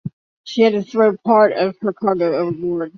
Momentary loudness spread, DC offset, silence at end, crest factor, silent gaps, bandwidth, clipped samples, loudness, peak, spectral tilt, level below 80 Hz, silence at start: 8 LU; under 0.1%; 0.1 s; 16 dB; 0.13-0.44 s; 6.8 kHz; under 0.1%; -17 LUFS; 0 dBFS; -7 dB/octave; -60 dBFS; 0.05 s